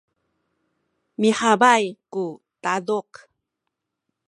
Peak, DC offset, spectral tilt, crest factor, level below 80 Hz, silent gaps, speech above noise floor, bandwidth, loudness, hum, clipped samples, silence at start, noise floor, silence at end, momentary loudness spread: -2 dBFS; under 0.1%; -4 dB/octave; 22 dB; -74 dBFS; none; 60 dB; 11.5 kHz; -21 LUFS; none; under 0.1%; 1.2 s; -81 dBFS; 1.25 s; 14 LU